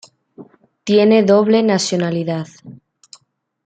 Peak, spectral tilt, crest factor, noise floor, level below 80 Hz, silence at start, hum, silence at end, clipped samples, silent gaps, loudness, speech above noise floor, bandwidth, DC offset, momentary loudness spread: -2 dBFS; -5.5 dB/octave; 16 dB; -59 dBFS; -64 dBFS; 0.4 s; none; 0.9 s; under 0.1%; none; -15 LUFS; 44 dB; 9.2 kHz; under 0.1%; 15 LU